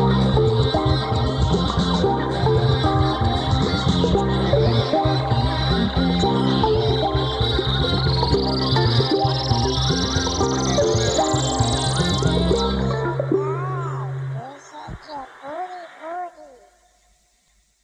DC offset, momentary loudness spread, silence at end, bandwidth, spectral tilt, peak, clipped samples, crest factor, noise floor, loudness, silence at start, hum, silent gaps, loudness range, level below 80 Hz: under 0.1%; 13 LU; 1.35 s; 10 kHz; -5.5 dB/octave; -6 dBFS; under 0.1%; 16 dB; -62 dBFS; -20 LUFS; 0 s; none; none; 9 LU; -32 dBFS